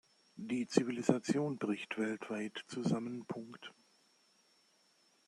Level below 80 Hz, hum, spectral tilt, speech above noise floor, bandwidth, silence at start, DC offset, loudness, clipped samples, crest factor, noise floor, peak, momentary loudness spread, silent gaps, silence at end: -82 dBFS; none; -5.5 dB/octave; 35 dB; 12 kHz; 0.35 s; under 0.1%; -37 LUFS; under 0.1%; 28 dB; -72 dBFS; -12 dBFS; 17 LU; none; 1.55 s